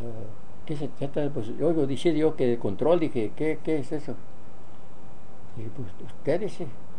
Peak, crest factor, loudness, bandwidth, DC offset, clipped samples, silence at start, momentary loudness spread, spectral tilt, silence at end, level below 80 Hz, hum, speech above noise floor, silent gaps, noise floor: -10 dBFS; 20 dB; -28 LUFS; 10 kHz; 6%; under 0.1%; 0 s; 17 LU; -7.5 dB/octave; 0 s; -60 dBFS; none; 22 dB; none; -50 dBFS